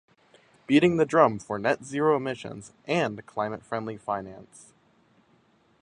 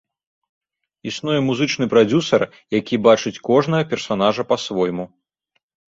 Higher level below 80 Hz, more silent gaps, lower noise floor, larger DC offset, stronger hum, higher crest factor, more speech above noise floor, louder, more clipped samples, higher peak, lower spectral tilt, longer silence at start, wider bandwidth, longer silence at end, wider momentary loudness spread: second, -64 dBFS vs -58 dBFS; neither; second, -64 dBFS vs -71 dBFS; neither; neither; about the same, 22 dB vs 18 dB; second, 38 dB vs 53 dB; second, -26 LUFS vs -19 LUFS; neither; about the same, -4 dBFS vs -2 dBFS; about the same, -6 dB/octave vs -5.5 dB/octave; second, 0.7 s vs 1.05 s; first, 10.5 kHz vs 7.8 kHz; first, 1.4 s vs 0.9 s; first, 16 LU vs 10 LU